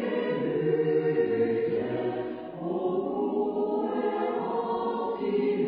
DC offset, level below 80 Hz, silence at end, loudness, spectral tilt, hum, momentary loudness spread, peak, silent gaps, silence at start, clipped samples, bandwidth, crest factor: under 0.1%; -66 dBFS; 0 s; -28 LUFS; -11 dB/octave; none; 5 LU; -14 dBFS; none; 0 s; under 0.1%; 5 kHz; 14 dB